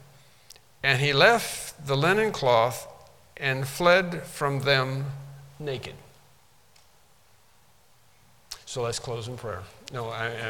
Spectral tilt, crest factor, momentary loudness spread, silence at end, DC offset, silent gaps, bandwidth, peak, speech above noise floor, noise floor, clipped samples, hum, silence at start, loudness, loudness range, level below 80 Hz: -4 dB/octave; 24 dB; 18 LU; 0 s; 0.1%; none; 18 kHz; -4 dBFS; 36 dB; -61 dBFS; under 0.1%; none; 0.85 s; -25 LUFS; 18 LU; -58 dBFS